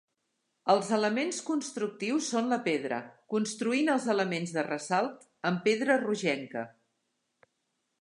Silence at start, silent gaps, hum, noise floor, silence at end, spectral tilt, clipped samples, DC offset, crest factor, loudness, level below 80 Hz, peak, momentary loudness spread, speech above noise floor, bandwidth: 0.65 s; none; none; -80 dBFS; 1.35 s; -4.5 dB/octave; under 0.1%; under 0.1%; 20 dB; -30 LUFS; -82 dBFS; -10 dBFS; 9 LU; 50 dB; 11.5 kHz